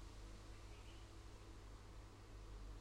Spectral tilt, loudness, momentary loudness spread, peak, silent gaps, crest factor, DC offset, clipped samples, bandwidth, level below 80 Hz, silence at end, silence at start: -5 dB/octave; -60 LUFS; 2 LU; -46 dBFS; none; 10 dB; under 0.1%; under 0.1%; 15.5 kHz; -58 dBFS; 0 s; 0 s